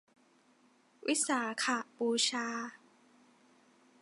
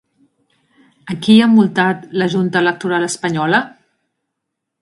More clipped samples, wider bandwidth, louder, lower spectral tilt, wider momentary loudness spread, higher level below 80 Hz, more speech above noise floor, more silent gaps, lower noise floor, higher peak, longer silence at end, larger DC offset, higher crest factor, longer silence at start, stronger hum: neither; about the same, 11.5 kHz vs 11.5 kHz; second, -33 LUFS vs -14 LUFS; second, -1 dB/octave vs -5.5 dB/octave; about the same, 11 LU vs 9 LU; second, -88 dBFS vs -60 dBFS; second, 34 dB vs 63 dB; neither; second, -68 dBFS vs -77 dBFS; second, -18 dBFS vs 0 dBFS; first, 1.25 s vs 1.1 s; neither; about the same, 20 dB vs 16 dB; about the same, 1.05 s vs 1.05 s; neither